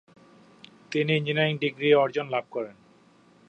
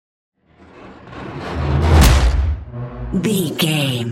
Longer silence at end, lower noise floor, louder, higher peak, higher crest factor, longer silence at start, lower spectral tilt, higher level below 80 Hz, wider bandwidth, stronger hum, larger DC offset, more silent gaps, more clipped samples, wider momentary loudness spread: first, 0.75 s vs 0 s; first, -58 dBFS vs -44 dBFS; second, -25 LUFS vs -17 LUFS; second, -8 dBFS vs 0 dBFS; about the same, 20 dB vs 16 dB; first, 0.9 s vs 0.75 s; first, -6.5 dB/octave vs -5 dB/octave; second, -76 dBFS vs -22 dBFS; second, 8.2 kHz vs 16.5 kHz; neither; neither; neither; neither; second, 14 LU vs 18 LU